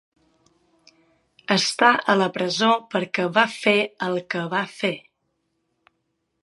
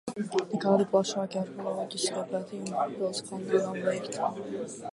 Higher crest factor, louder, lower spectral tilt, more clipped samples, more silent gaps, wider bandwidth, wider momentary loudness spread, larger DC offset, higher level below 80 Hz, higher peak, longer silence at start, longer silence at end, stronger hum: about the same, 24 dB vs 20 dB; first, -21 LUFS vs -30 LUFS; about the same, -4 dB/octave vs -4.5 dB/octave; neither; neither; about the same, 11.5 kHz vs 11.5 kHz; about the same, 10 LU vs 9 LU; neither; about the same, -74 dBFS vs -76 dBFS; first, 0 dBFS vs -10 dBFS; first, 1.5 s vs 0.05 s; first, 1.45 s vs 0 s; neither